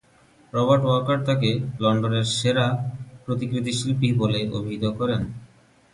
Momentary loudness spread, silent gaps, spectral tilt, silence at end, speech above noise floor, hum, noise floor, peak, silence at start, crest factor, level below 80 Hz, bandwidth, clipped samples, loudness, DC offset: 10 LU; none; -6 dB/octave; 0.5 s; 34 dB; none; -56 dBFS; -6 dBFS; 0.55 s; 18 dB; -52 dBFS; 11.5 kHz; under 0.1%; -23 LUFS; under 0.1%